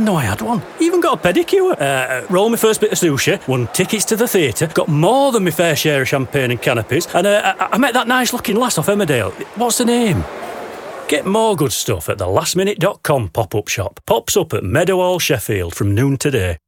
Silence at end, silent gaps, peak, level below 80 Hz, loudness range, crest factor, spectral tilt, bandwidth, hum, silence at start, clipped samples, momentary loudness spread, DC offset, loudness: 0.1 s; none; -2 dBFS; -44 dBFS; 2 LU; 14 dB; -4.5 dB/octave; 19 kHz; none; 0 s; under 0.1%; 6 LU; under 0.1%; -16 LUFS